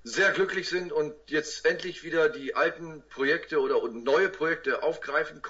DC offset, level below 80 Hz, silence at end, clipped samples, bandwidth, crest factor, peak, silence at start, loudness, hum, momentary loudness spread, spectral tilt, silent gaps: under 0.1%; -64 dBFS; 0 s; under 0.1%; 8 kHz; 16 dB; -12 dBFS; 0.05 s; -27 LUFS; none; 6 LU; -3.5 dB/octave; none